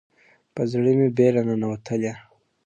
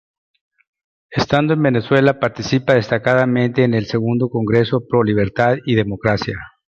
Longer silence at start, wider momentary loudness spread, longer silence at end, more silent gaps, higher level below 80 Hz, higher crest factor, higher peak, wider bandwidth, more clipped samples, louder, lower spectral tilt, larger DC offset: second, 0.55 s vs 1.1 s; first, 13 LU vs 5 LU; first, 0.45 s vs 0.25 s; neither; second, -62 dBFS vs -46 dBFS; about the same, 16 dB vs 16 dB; second, -6 dBFS vs -2 dBFS; first, 8.8 kHz vs 7.4 kHz; neither; second, -22 LUFS vs -17 LUFS; first, -8.5 dB/octave vs -7 dB/octave; neither